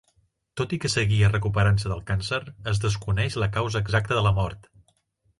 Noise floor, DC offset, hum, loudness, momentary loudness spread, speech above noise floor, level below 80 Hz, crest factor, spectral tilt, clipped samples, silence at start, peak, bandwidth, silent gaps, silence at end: -67 dBFS; under 0.1%; none; -25 LUFS; 8 LU; 44 dB; -40 dBFS; 16 dB; -5.5 dB/octave; under 0.1%; 0.55 s; -8 dBFS; 11.5 kHz; none; 0.8 s